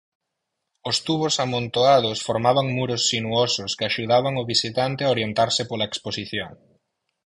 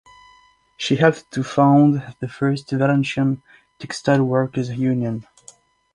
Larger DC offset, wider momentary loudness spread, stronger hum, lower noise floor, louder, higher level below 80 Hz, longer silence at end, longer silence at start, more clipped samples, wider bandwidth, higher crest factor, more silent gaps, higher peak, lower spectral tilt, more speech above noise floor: neither; second, 9 LU vs 14 LU; neither; first, -80 dBFS vs -54 dBFS; second, -22 LUFS vs -19 LUFS; about the same, -58 dBFS vs -58 dBFS; about the same, 0.7 s vs 0.7 s; about the same, 0.85 s vs 0.8 s; neither; about the same, 11.5 kHz vs 10.5 kHz; about the same, 18 dB vs 18 dB; neither; about the same, -4 dBFS vs -2 dBFS; second, -4 dB/octave vs -7 dB/octave; first, 58 dB vs 35 dB